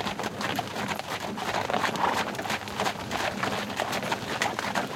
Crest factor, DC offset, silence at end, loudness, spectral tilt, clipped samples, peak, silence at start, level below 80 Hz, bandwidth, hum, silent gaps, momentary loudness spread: 20 dB; under 0.1%; 0 s; -29 LUFS; -3.5 dB/octave; under 0.1%; -10 dBFS; 0 s; -60 dBFS; 17 kHz; none; none; 5 LU